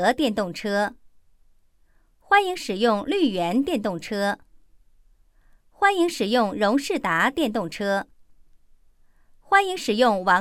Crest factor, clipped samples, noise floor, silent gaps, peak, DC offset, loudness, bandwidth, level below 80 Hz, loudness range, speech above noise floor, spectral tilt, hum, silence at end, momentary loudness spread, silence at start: 20 dB; under 0.1%; -59 dBFS; none; -4 dBFS; under 0.1%; -23 LUFS; 16.5 kHz; -56 dBFS; 2 LU; 37 dB; -4.5 dB/octave; none; 0 s; 7 LU; 0 s